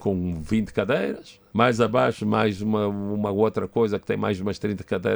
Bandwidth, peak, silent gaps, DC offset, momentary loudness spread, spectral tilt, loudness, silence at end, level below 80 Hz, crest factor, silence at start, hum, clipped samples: over 20 kHz; -4 dBFS; none; under 0.1%; 7 LU; -7 dB/octave; -24 LUFS; 0 s; -52 dBFS; 18 dB; 0 s; none; under 0.1%